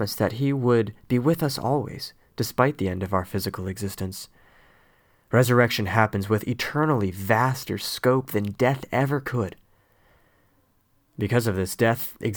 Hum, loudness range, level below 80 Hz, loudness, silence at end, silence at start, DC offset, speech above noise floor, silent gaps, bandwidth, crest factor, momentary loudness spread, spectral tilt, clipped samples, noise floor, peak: none; 5 LU; -56 dBFS; -24 LUFS; 0 s; 0 s; under 0.1%; 41 dB; none; over 20 kHz; 22 dB; 10 LU; -6 dB/octave; under 0.1%; -65 dBFS; -2 dBFS